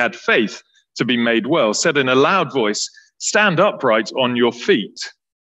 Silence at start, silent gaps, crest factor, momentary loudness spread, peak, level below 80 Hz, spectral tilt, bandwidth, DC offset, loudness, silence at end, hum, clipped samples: 0 s; none; 16 dB; 12 LU; -2 dBFS; -68 dBFS; -3.5 dB/octave; 9 kHz; under 0.1%; -17 LUFS; 0.4 s; none; under 0.1%